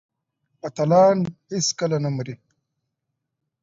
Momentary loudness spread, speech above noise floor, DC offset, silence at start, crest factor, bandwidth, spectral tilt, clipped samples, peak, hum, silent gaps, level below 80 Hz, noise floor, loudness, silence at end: 18 LU; 60 dB; under 0.1%; 0.65 s; 18 dB; 7.8 kHz; -5 dB/octave; under 0.1%; -6 dBFS; none; none; -64 dBFS; -80 dBFS; -21 LUFS; 1.25 s